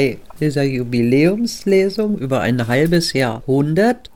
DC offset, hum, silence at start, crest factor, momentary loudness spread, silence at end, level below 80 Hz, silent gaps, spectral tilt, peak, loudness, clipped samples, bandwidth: 1%; none; 0 s; 14 dB; 6 LU; 0.1 s; -44 dBFS; none; -6 dB/octave; -4 dBFS; -17 LUFS; under 0.1%; 17.5 kHz